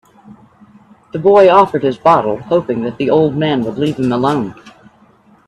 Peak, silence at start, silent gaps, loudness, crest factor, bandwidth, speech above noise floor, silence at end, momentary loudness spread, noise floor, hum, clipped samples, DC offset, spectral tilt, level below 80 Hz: 0 dBFS; 0.3 s; none; -13 LUFS; 14 dB; 10.5 kHz; 36 dB; 0.75 s; 10 LU; -48 dBFS; none; under 0.1%; under 0.1%; -7.5 dB/octave; -54 dBFS